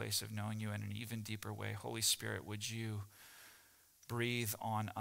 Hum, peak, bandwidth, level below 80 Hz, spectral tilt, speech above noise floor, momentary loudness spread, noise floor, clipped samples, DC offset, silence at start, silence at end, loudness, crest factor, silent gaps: none; -20 dBFS; 16 kHz; -76 dBFS; -3.5 dB/octave; 26 dB; 21 LU; -67 dBFS; under 0.1%; under 0.1%; 0 s; 0 s; -41 LUFS; 22 dB; none